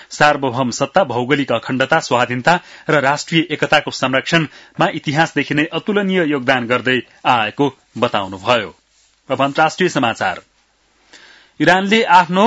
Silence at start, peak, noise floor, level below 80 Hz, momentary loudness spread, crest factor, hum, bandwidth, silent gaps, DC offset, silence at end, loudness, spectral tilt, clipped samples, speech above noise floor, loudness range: 0.1 s; 0 dBFS; -58 dBFS; -56 dBFS; 5 LU; 16 dB; none; 10.5 kHz; none; under 0.1%; 0 s; -16 LUFS; -4.5 dB/octave; under 0.1%; 42 dB; 3 LU